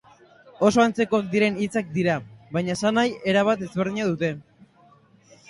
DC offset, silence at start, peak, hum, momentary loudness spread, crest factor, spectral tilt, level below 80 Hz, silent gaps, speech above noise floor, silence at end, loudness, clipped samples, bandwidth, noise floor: under 0.1%; 0.6 s; -4 dBFS; none; 8 LU; 20 dB; -5.5 dB/octave; -60 dBFS; none; 34 dB; 1.1 s; -23 LUFS; under 0.1%; 11.5 kHz; -56 dBFS